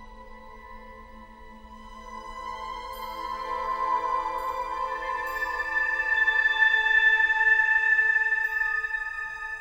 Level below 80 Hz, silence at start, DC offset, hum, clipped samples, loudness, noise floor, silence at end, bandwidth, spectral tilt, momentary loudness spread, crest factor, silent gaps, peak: -50 dBFS; 0 s; under 0.1%; none; under 0.1%; -23 LUFS; -46 dBFS; 0 s; 16.5 kHz; -1.5 dB/octave; 17 LU; 16 dB; none; -10 dBFS